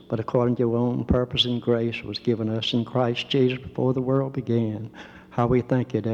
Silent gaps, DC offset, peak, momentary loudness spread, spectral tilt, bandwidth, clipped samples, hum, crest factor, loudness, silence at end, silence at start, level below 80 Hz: none; under 0.1%; -8 dBFS; 6 LU; -7.5 dB/octave; 7.8 kHz; under 0.1%; none; 16 dB; -24 LUFS; 0 s; 0.1 s; -46 dBFS